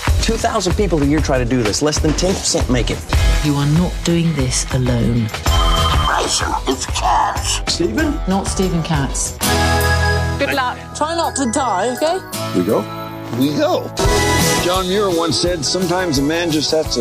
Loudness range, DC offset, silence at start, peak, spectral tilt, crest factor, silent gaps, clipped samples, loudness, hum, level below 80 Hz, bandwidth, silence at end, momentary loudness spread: 2 LU; under 0.1%; 0 s; -4 dBFS; -4.5 dB/octave; 12 dB; none; under 0.1%; -17 LUFS; none; -24 dBFS; 15.5 kHz; 0 s; 4 LU